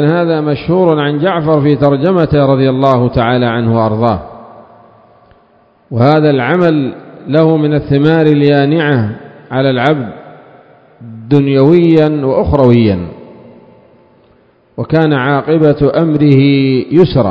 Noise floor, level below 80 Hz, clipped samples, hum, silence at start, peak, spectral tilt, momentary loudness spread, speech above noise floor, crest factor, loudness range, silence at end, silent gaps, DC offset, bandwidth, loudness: -49 dBFS; -36 dBFS; 0.7%; none; 0 s; 0 dBFS; -9.5 dB/octave; 10 LU; 39 dB; 10 dB; 4 LU; 0 s; none; under 0.1%; 5.4 kHz; -10 LUFS